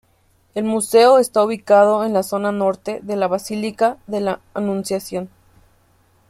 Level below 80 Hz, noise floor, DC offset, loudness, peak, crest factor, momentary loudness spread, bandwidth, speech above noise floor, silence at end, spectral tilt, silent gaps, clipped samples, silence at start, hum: -60 dBFS; -59 dBFS; under 0.1%; -18 LUFS; -2 dBFS; 16 dB; 12 LU; 16 kHz; 41 dB; 1.05 s; -5 dB/octave; none; under 0.1%; 0.55 s; none